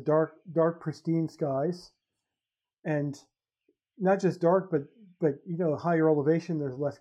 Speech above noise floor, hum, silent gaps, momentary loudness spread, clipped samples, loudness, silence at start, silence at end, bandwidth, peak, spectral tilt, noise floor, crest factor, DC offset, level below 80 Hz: over 62 dB; none; none; 10 LU; under 0.1%; -29 LUFS; 0 s; 0.05 s; 9 kHz; -12 dBFS; -8.5 dB/octave; under -90 dBFS; 16 dB; under 0.1%; -80 dBFS